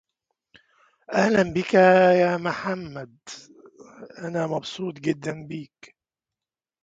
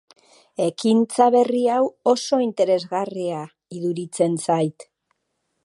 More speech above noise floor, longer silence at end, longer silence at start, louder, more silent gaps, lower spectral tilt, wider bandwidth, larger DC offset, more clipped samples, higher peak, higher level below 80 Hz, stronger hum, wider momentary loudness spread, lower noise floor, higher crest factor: first, over 67 dB vs 54 dB; first, 1.2 s vs 0.8 s; first, 1.1 s vs 0.6 s; about the same, -22 LUFS vs -21 LUFS; neither; about the same, -6 dB/octave vs -5.5 dB/octave; second, 7.8 kHz vs 11.5 kHz; neither; neither; about the same, -4 dBFS vs -2 dBFS; first, -62 dBFS vs -76 dBFS; neither; first, 23 LU vs 11 LU; first, under -90 dBFS vs -74 dBFS; about the same, 20 dB vs 20 dB